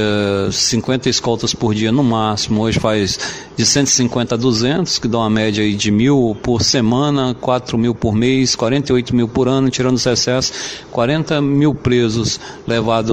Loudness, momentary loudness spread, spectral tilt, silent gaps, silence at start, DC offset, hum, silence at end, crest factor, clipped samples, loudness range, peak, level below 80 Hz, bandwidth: -15 LUFS; 5 LU; -4.5 dB/octave; none; 0 s; under 0.1%; none; 0 s; 14 dB; under 0.1%; 1 LU; 0 dBFS; -40 dBFS; 15.5 kHz